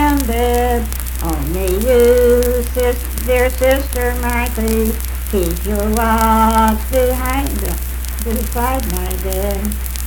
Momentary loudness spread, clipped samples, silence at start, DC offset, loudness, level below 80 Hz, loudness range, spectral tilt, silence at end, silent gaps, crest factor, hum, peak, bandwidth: 9 LU; under 0.1%; 0 s; under 0.1%; -16 LUFS; -20 dBFS; 2 LU; -5.5 dB/octave; 0 s; none; 16 dB; none; 0 dBFS; 19.5 kHz